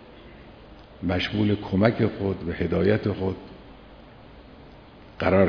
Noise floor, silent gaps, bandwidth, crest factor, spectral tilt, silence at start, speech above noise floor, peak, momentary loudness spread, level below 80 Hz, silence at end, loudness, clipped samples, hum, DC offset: -47 dBFS; none; 5.4 kHz; 22 dB; -8.5 dB/octave; 0 s; 24 dB; -4 dBFS; 25 LU; -48 dBFS; 0 s; -25 LUFS; under 0.1%; none; under 0.1%